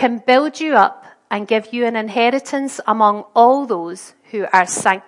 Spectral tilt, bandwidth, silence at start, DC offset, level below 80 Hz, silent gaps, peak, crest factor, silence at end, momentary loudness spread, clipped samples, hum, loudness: -3.5 dB/octave; 11.5 kHz; 0 s; under 0.1%; -72 dBFS; none; 0 dBFS; 16 dB; 0.1 s; 12 LU; under 0.1%; none; -16 LUFS